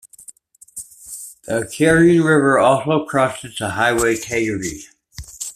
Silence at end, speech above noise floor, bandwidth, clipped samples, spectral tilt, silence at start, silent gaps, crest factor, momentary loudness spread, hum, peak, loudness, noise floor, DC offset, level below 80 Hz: 0.05 s; 29 dB; 14.5 kHz; under 0.1%; -5 dB/octave; 0.75 s; none; 16 dB; 22 LU; none; -2 dBFS; -17 LUFS; -45 dBFS; under 0.1%; -46 dBFS